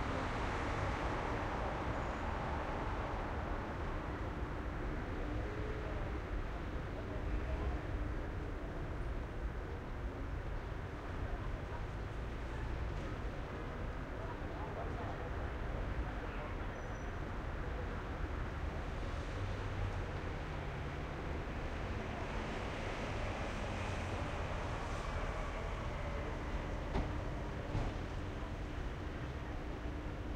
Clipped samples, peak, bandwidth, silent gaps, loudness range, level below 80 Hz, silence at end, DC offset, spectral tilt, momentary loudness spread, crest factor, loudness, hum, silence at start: under 0.1%; -24 dBFS; 10 kHz; none; 3 LU; -44 dBFS; 0 s; under 0.1%; -6.5 dB/octave; 5 LU; 16 dB; -42 LUFS; none; 0 s